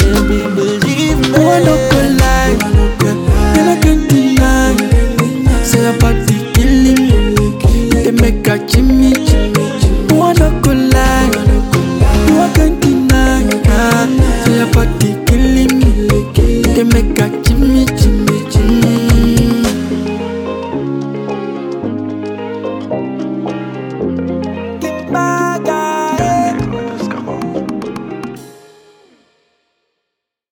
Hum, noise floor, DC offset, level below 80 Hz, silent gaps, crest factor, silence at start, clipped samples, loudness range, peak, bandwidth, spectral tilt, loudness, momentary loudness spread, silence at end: none; -76 dBFS; under 0.1%; -16 dBFS; none; 10 dB; 0 s; under 0.1%; 9 LU; 0 dBFS; 19 kHz; -6 dB/octave; -12 LUFS; 11 LU; 2 s